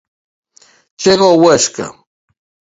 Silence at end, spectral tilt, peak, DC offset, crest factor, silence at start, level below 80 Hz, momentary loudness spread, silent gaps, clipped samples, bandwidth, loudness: 0.8 s; -3.5 dB/octave; 0 dBFS; under 0.1%; 14 dB; 1 s; -54 dBFS; 16 LU; none; under 0.1%; 8 kHz; -11 LUFS